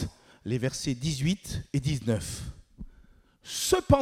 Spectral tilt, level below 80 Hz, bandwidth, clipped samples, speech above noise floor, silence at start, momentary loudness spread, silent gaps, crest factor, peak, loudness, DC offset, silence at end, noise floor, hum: -5 dB/octave; -46 dBFS; 16.5 kHz; under 0.1%; 30 dB; 0 s; 23 LU; none; 22 dB; -8 dBFS; -30 LUFS; under 0.1%; 0 s; -58 dBFS; none